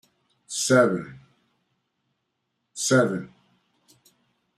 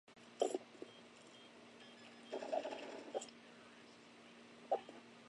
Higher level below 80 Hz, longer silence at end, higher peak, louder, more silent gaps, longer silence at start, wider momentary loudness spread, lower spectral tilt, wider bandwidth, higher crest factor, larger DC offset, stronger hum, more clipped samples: first, -68 dBFS vs under -90 dBFS; first, 1.3 s vs 0 s; first, -8 dBFS vs -22 dBFS; first, -23 LUFS vs -46 LUFS; neither; first, 0.5 s vs 0.05 s; first, 23 LU vs 18 LU; about the same, -4 dB/octave vs -3 dB/octave; first, 14 kHz vs 11 kHz; second, 20 dB vs 26 dB; neither; neither; neither